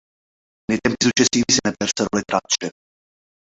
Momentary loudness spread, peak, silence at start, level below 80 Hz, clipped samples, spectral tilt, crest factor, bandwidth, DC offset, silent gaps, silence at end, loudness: 8 LU; -2 dBFS; 0.7 s; -52 dBFS; under 0.1%; -2.5 dB/octave; 20 dB; 8.2 kHz; under 0.1%; none; 0.7 s; -19 LUFS